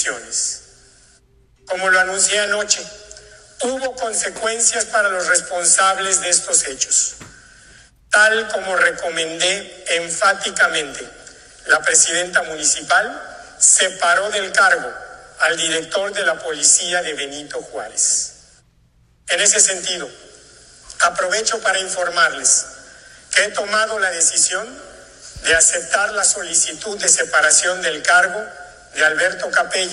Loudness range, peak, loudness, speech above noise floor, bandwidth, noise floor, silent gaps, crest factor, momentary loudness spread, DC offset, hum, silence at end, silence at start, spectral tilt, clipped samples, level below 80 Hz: 3 LU; 0 dBFS; -16 LUFS; 38 dB; 13 kHz; -55 dBFS; none; 18 dB; 13 LU; under 0.1%; none; 0 s; 0 s; 1 dB/octave; under 0.1%; -54 dBFS